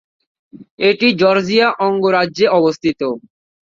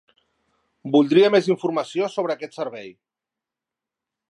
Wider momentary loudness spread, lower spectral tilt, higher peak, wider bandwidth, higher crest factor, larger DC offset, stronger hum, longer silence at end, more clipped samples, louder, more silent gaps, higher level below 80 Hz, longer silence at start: second, 8 LU vs 16 LU; about the same, -5.5 dB/octave vs -6 dB/octave; about the same, -2 dBFS vs -4 dBFS; second, 7.6 kHz vs 10.5 kHz; about the same, 14 dB vs 18 dB; neither; neither; second, 0.45 s vs 1.4 s; neither; first, -14 LUFS vs -21 LUFS; first, 0.71-0.78 s vs none; first, -58 dBFS vs -78 dBFS; second, 0.55 s vs 0.85 s